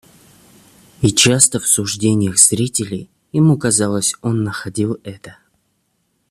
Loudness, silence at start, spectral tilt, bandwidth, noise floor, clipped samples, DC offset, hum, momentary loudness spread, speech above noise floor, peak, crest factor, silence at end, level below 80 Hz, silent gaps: -15 LUFS; 1 s; -3.5 dB/octave; 15 kHz; -66 dBFS; under 0.1%; under 0.1%; none; 13 LU; 50 dB; 0 dBFS; 18 dB; 1 s; -50 dBFS; none